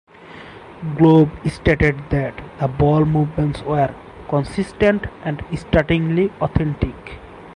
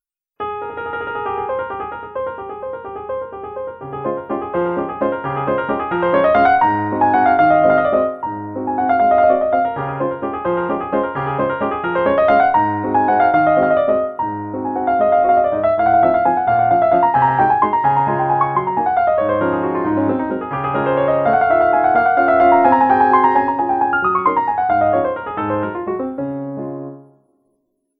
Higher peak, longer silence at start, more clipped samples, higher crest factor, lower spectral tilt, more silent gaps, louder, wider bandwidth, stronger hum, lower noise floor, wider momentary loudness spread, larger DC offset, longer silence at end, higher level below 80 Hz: about the same, -2 dBFS vs 0 dBFS; second, 0.2 s vs 0.4 s; neither; about the same, 16 dB vs 16 dB; second, -8.5 dB/octave vs -10 dB/octave; neither; second, -19 LUFS vs -16 LUFS; first, 10.5 kHz vs 4.8 kHz; neither; second, -39 dBFS vs -68 dBFS; first, 21 LU vs 13 LU; neither; second, 0 s vs 0.95 s; first, -34 dBFS vs -48 dBFS